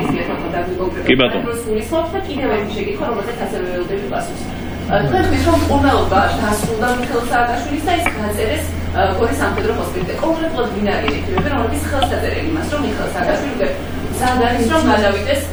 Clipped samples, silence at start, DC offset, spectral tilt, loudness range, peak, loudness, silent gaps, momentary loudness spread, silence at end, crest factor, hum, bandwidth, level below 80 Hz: under 0.1%; 0 s; under 0.1%; -5.5 dB/octave; 4 LU; 0 dBFS; -18 LUFS; none; 8 LU; 0 s; 16 dB; none; over 20 kHz; -30 dBFS